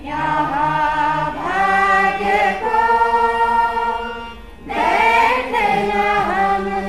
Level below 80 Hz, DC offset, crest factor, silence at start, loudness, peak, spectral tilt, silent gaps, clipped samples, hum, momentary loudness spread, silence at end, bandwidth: -40 dBFS; 0.8%; 14 dB; 0 s; -16 LUFS; -2 dBFS; -4.5 dB/octave; none; under 0.1%; none; 8 LU; 0 s; 13.5 kHz